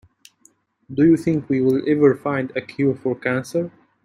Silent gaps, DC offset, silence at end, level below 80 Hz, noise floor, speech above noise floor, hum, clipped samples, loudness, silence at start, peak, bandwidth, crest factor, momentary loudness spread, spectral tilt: none; under 0.1%; 0.35 s; -58 dBFS; -58 dBFS; 39 dB; none; under 0.1%; -20 LUFS; 0.9 s; -4 dBFS; 13 kHz; 18 dB; 10 LU; -8 dB/octave